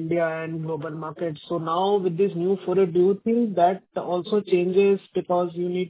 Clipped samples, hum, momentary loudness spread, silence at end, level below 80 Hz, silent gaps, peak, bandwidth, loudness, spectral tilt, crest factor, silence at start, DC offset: under 0.1%; none; 10 LU; 0 s; -68 dBFS; none; -8 dBFS; 4 kHz; -24 LUFS; -11.5 dB/octave; 16 dB; 0 s; under 0.1%